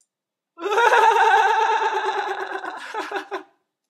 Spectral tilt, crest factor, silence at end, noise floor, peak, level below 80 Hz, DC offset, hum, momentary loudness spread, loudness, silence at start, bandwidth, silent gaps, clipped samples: 0 dB/octave; 18 dB; 0.45 s; -85 dBFS; -2 dBFS; under -90 dBFS; under 0.1%; none; 16 LU; -19 LUFS; 0.6 s; 13.5 kHz; none; under 0.1%